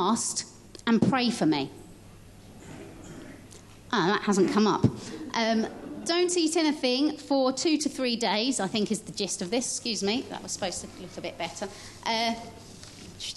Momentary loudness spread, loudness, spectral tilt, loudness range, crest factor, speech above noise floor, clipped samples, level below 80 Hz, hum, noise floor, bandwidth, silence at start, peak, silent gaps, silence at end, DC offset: 20 LU; -27 LUFS; -4 dB/octave; 5 LU; 20 dB; 22 dB; under 0.1%; -58 dBFS; none; -49 dBFS; 12.5 kHz; 0 s; -10 dBFS; none; 0 s; under 0.1%